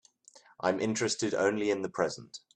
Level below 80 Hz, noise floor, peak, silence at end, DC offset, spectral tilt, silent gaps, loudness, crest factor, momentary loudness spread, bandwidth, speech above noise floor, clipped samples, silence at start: -70 dBFS; -60 dBFS; -12 dBFS; 0.2 s; under 0.1%; -4 dB/octave; none; -31 LUFS; 20 dB; 5 LU; 10.5 kHz; 29 dB; under 0.1%; 0.35 s